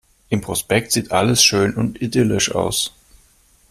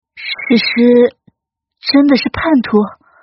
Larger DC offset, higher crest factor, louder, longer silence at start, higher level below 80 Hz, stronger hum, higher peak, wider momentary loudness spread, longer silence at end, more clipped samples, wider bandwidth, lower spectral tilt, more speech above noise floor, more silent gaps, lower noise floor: neither; first, 18 dB vs 12 dB; second, -18 LUFS vs -12 LUFS; first, 0.3 s vs 0.15 s; about the same, -46 dBFS vs -46 dBFS; neither; about the same, 0 dBFS vs 0 dBFS; about the same, 10 LU vs 12 LU; first, 0.8 s vs 0.3 s; neither; first, 15.5 kHz vs 6 kHz; about the same, -3.5 dB/octave vs -3.5 dB/octave; second, 37 dB vs 64 dB; neither; second, -55 dBFS vs -75 dBFS